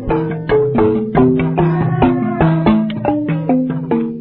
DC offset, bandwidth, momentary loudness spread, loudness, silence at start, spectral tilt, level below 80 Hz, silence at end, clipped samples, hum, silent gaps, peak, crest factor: under 0.1%; 4.3 kHz; 5 LU; -15 LUFS; 0 s; -13 dB/octave; -34 dBFS; 0 s; under 0.1%; none; none; 0 dBFS; 14 dB